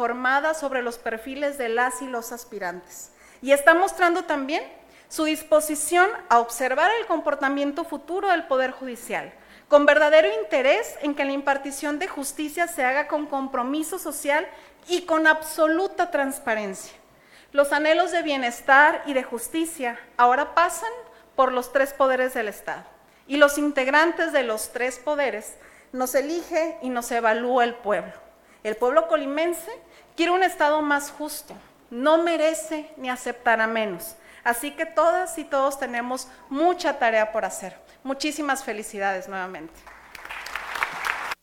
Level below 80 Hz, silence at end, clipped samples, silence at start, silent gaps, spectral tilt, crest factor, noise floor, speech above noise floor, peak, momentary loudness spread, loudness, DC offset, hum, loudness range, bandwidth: -60 dBFS; 0.1 s; under 0.1%; 0 s; none; -2 dB/octave; 24 dB; -53 dBFS; 30 dB; 0 dBFS; 15 LU; -23 LUFS; under 0.1%; none; 5 LU; 17.5 kHz